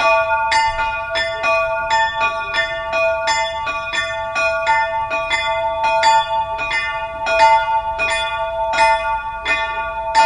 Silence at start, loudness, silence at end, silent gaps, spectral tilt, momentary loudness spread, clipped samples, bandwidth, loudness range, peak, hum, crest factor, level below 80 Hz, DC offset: 0 s; -17 LUFS; 0 s; none; -1.5 dB/octave; 7 LU; under 0.1%; 10.5 kHz; 2 LU; 0 dBFS; none; 16 dB; -42 dBFS; under 0.1%